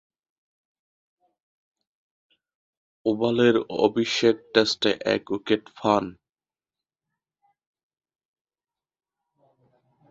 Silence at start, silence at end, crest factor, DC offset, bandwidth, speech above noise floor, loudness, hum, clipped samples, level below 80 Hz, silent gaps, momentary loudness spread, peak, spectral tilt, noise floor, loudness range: 3.05 s; 4 s; 24 dB; under 0.1%; 8 kHz; over 67 dB; -23 LUFS; none; under 0.1%; -66 dBFS; none; 6 LU; -4 dBFS; -4.5 dB/octave; under -90 dBFS; 9 LU